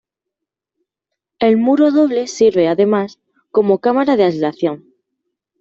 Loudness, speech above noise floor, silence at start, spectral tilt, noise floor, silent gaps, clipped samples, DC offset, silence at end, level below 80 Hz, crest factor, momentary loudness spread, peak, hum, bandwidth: -15 LUFS; 68 dB; 1.4 s; -6 dB/octave; -81 dBFS; none; under 0.1%; under 0.1%; 0.85 s; -60 dBFS; 14 dB; 8 LU; -2 dBFS; none; 7.8 kHz